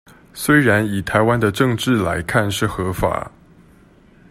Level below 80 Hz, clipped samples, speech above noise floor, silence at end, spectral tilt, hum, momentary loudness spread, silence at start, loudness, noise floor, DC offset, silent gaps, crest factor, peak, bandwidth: -42 dBFS; under 0.1%; 32 dB; 1.05 s; -5.5 dB/octave; none; 10 LU; 0.35 s; -18 LUFS; -49 dBFS; under 0.1%; none; 18 dB; -2 dBFS; 16 kHz